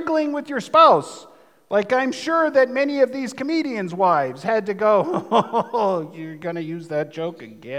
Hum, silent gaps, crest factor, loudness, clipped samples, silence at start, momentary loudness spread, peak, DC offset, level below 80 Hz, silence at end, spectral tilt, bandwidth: none; none; 18 dB; -20 LUFS; under 0.1%; 0 s; 14 LU; -2 dBFS; under 0.1%; -76 dBFS; 0 s; -5.5 dB/octave; 12.5 kHz